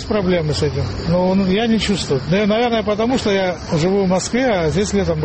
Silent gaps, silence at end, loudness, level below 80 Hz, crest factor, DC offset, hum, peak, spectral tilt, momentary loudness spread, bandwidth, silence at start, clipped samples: none; 0 s; -17 LUFS; -36 dBFS; 10 dB; 0.3%; none; -6 dBFS; -5.5 dB/octave; 3 LU; 8.8 kHz; 0 s; under 0.1%